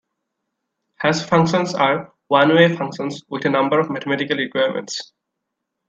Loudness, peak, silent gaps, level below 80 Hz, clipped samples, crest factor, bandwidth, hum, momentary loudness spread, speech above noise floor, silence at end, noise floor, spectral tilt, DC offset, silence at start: -19 LUFS; 0 dBFS; none; -62 dBFS; under 0.1%; 20 dB; 8 kHz; none; 12 LU; 61 dB; 0.85 s; -79 dBFS; -5.5 dB/octave; under 0.1%; 1 s